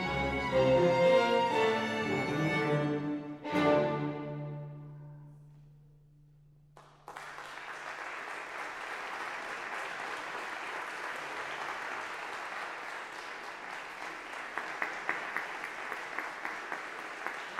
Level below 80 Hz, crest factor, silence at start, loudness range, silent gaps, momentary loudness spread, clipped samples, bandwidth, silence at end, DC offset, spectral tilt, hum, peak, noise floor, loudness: -60 dBFS; 20 dB; 0 s; 16 LU; none; 15 LU; under 0.1%; 14.5 kHz; 0 s; under 0.1%; -5.5 dB/octave; none; -16 dBFS; -60 dBFS; -34 LUFS